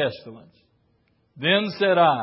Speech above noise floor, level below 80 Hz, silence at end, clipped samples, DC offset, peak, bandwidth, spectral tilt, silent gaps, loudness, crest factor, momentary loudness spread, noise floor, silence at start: 44 dB; -68 dBFS; 0 s; under 0.1%; under 0.1%; -6 dBFS; 5.8 kHz; -9.5 dB/octave; none; -21 LUFS; 18 dB; 11 LU; -66 dBFS; 0 s